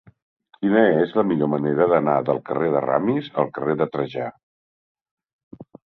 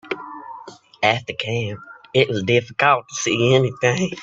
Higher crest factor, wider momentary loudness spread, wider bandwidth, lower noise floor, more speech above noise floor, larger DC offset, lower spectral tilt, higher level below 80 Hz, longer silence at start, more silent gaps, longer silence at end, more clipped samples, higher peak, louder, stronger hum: about the same, 20 dB vs 20 dB; second, 9 LU vs 18 LU; second, 5.4 kHz vs 8 kHz; first, under -90 dBFS vs -41 dBFS; first, over 70 dB vs 22 dB; neither; first, -10 dB/octave vs -4.5 dB/octave; about the same, -62 dBFS vs -58 dBFS; first, 0.6 s vs 0.05 s; first, 4.43-4.95 s, 5.11-5.17 s, 5.33-5.51 s vs none; first, 0.35 s vs 0 s; neither; about the same, -2 dBFS vs 0 dBFS; about the same, -21 LUFS vs -20 LUFS; neither